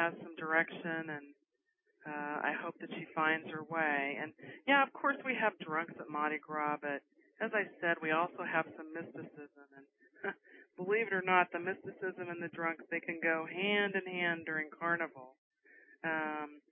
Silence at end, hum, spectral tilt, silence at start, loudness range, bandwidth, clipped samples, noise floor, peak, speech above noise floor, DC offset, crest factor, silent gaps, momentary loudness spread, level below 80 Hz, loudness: 0.1 s; none; 0.5 dB/octave; 0 s; 4 LU; 3.7 kHz; under 0.1%; -82 dBFS; -12 dBFS; 45 dB; under 0.1%; 24 dB; 15.38-15.51 s; 14 LU; under -90 dBFS; -36 LUFS